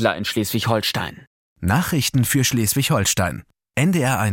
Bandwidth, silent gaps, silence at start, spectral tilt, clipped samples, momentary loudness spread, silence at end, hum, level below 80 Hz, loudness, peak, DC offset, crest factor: 17 kHz; 1.27-1.56 s; 0 s; -4 dB/octave; under 0.1%; 9 LU; 0 s; none; -48 dBFS; -20 LUFS; -2 dBFS; under 0.1%; 18 dB